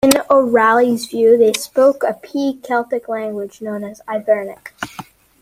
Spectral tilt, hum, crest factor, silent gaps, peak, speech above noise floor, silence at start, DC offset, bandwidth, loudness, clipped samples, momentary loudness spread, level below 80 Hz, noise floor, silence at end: -3.5 dB/octave; none; 16 dB; none; 0 dBFS; 21 dB; 0.05 s; under 0.1%; 16 kHz; -16 LUFS; under 0.1%; 17 LU; -56 dBFS; -37 dBFS; 0.4 s